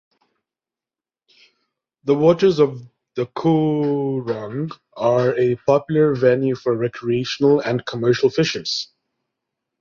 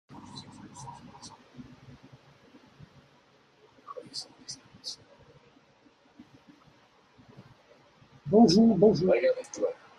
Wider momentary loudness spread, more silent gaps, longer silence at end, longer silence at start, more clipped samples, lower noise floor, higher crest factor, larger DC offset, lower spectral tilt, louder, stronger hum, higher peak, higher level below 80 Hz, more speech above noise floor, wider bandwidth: second, 12 LU vs 28 LU; neither; first, 0.95 s vs 0.25 s; first, 2.05 s vs 0.15 s; neither; first, under -90 dBFS vs -62 dBFS; about the same, 18 dB vs 22 dB; neither; about the same, -6.5 dB/octave vs -6 dB/octave; first, -19 LUFS vs -25 LUFS; neither; first, -2 dBFS vs -8 dBFS; about the same, -60 dBFS vs -64 dBFS; first, over 72 dB vs 40 dB; second, 7.4 kHz vs 10.5 kHz